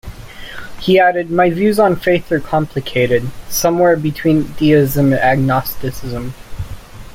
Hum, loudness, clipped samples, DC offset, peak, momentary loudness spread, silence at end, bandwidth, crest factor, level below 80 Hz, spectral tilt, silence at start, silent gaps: none; -15 LUFS; under 0.1%; under 0.1%; -2 dBFS; 18 LU; 0 s; 16.5 kHz; 14 dB; -36 dBFS; -6 dB/octave; 0.05 s; none